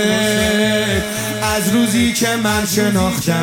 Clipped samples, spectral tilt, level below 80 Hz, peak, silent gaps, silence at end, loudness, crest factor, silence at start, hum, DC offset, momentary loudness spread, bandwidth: under 0.1%; -4 dB/octave; -38 dBFS; -2 dBFS; none; 0 s; -16 LUFS; 14 dB; 0 s; none; under 0.1%; 3 LU; 17 kHz